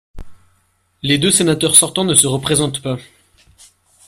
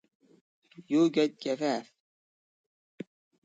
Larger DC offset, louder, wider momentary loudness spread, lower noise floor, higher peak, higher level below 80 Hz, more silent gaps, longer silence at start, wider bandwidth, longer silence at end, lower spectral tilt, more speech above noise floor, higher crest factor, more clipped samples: neither; first, -13 LUFS vs -29 LUFS; second, 15 LU vs 22 LU; second, -61 dBFS vs under -90 dBFS; first, 0 dBFS vs -14 dBFS; first, -44 dBFS vs -82 dBFS; neither; second, 0.15 s vs 0.8 s; first, 16 kHz vs 7.8 kHz; second, 1.05 s vs 1.6 s; second, -3 dB/octave vs -5.5 dB/octave; second, 46 dB vs over 62 dB; about the same, 18 dB vs 18 dB; first, 0.1% vs under 0.1%